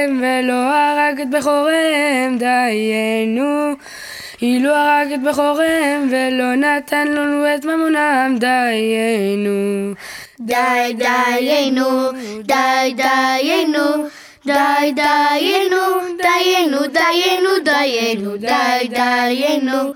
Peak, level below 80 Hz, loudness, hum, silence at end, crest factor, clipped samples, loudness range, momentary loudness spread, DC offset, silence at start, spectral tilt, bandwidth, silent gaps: -2 dBFS; -60 dBFS; -15 LUFS; none; 0 s; 14 dB; under 0.1%; 2 LU; 6 LU; under 0.1%; 0 s; -3.5 dB/octave; 18.5 kHz; none